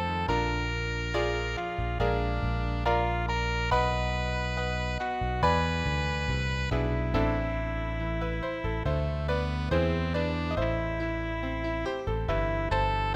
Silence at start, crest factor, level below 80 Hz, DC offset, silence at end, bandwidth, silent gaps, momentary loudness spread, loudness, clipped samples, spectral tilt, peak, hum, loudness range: 0 s; 18 dB; -34 dBFS; under 0.1%; 0 s; 8 kHz; none; 5 LU; -29 LUFS; under 0.1%; -6.5 dB/octave; -12 dBFS; none; 2 LU